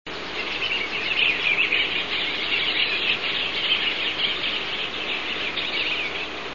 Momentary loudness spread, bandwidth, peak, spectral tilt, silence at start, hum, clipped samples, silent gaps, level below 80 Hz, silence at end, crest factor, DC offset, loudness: 7 LU; 7.4 kHz; -8 dBFS; -2.5 dB/octave; 0.05 s; none; under 0.1%; none; -54 dBFS; 0 s; 18 dB; 0.9%; -22 LUFS